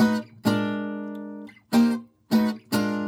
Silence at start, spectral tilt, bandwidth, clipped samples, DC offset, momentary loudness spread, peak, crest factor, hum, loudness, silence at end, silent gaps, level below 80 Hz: 0 s; -6 dB/octave; 17.5 kHz; under 0.1%; under 0.1%; 14 LU; -10 dBFS; 16 dB; none; -25 LUFS; 0 s; none; -64 dBFS